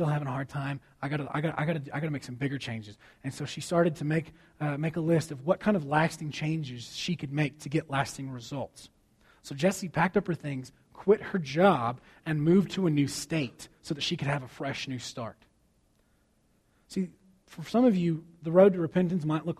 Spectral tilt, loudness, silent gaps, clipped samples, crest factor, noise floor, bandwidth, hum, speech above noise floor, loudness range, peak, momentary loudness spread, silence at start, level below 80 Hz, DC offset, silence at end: -6 dB/octave; -29 LUFS; none; under 0.1%; 22 dB; -68 dBFS; 14.5 kHz; none; 39 dB; 7 LU; -8 dBFS; 14 LU; 0 s; -62 dBFS; under 0.1%; 0.05 s